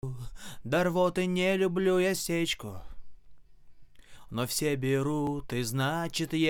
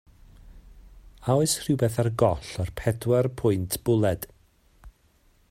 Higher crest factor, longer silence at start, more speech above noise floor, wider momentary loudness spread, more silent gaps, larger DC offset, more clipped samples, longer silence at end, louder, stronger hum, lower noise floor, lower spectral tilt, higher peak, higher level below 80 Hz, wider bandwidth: about the same, 16 dB vs 20 dB; second, 0.05 s vs 0.45 s; second, 21 dB vs 38 dB; first, 14 LU vs 9 LU; neither; neither; neither; second, 0 s vs 0.6 s; second, -29 LUFS vs -25 LUFS; neither; second, -49 dBFS vs -62 dBFS; about the same, -5 dB/octave vs -6 dB/octave; second, -14 dBFS vs -8 dBFS; about the same, -52 dBFS vs -48 dBFS; first, 19 kHz vs 16 kHz